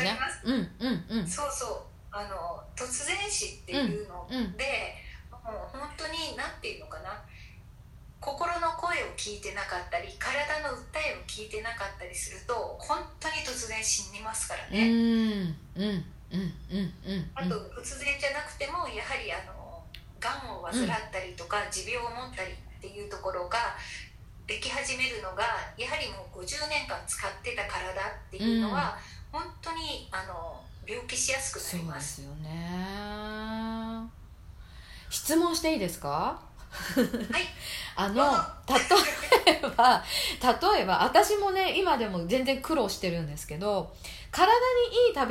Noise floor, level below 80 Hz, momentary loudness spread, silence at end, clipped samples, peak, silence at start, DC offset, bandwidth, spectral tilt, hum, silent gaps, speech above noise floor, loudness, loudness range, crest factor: -50 dBFS; -50 dBFS; 16 LU; 0 s; under 0.1%; -6 dBFS; 0 s; under 0.1%; 16 kHz; -3.5 dB/octave; none; none; 20 dB; -30 LUFS; 10 LU; 24 dB